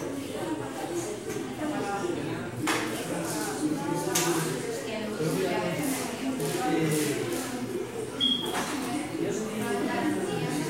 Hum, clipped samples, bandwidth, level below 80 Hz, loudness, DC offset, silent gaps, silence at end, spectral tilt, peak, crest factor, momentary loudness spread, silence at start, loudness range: none; under 0.1%; 16 kHz; -62 dBFS; -30 LUFS; under 0.1%; none; 0 s; -4 dB/octave; -12 dBFS; 18 dB; 7 LU; 0 s; 2 LU